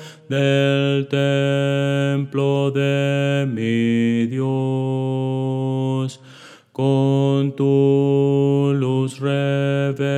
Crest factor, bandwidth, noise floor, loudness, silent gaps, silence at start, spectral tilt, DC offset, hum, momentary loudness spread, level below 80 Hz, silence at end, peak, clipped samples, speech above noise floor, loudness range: 14 dB; 9.2 kHz; -44 dBFS; -19 LUFS; none; 0 s; -7.5 dB/octave; under 0.1%; none; 5 LU; -78 dBFS; 0 s; -6 dBFS; under 0.1%; 26 dB; 3 LU